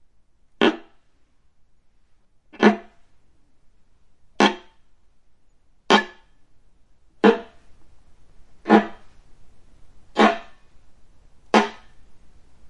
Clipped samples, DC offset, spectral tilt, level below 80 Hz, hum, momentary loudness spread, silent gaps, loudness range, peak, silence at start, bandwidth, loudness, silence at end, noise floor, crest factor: under 0.1%; under 0.1%; -5 dB/octave; -58 dBFS; none; 17 LU; none; 4 LU; 0 dBFS; 0.6 s; 10.5 kHz; -20 LUFS; 0 s; -56 dBFS; 24 dB